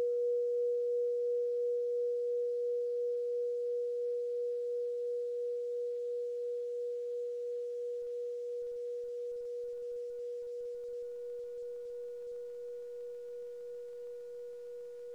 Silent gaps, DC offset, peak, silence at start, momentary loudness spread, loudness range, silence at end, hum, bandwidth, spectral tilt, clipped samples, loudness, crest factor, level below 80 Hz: none; under 0.1%; -28 dBFS; 0 s; 12 LU; 10 LU; 0 s; none; 7.2 kHz; -3.5 dB/octave; under 0.1%; -38 LUFS; 8 dB; -82 dBFS